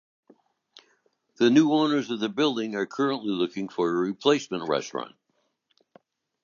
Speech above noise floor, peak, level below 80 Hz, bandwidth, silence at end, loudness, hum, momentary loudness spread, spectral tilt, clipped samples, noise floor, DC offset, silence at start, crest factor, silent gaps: 49 dB; -6 dBFS; -76 dBFS; 7.4 kHz; 1.35 s; -25 LUFS; none; 9 LU; -5 dB/octave; under 0.1%; -74 dBFS; under 0.1%; 1.4 s; 20 dB; none